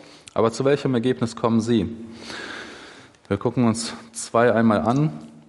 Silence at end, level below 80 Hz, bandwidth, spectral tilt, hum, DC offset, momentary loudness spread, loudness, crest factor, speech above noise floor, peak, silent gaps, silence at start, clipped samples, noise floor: 0.1 s; -60 dBFS; 11.5 kHz; -6 dB/octave; none; under 0.1%; 16 LU; -22 LUFS; 18 dB; 24 dB; -4 dBFS; none; 0.35 s; under 0.1%; -45 dBFS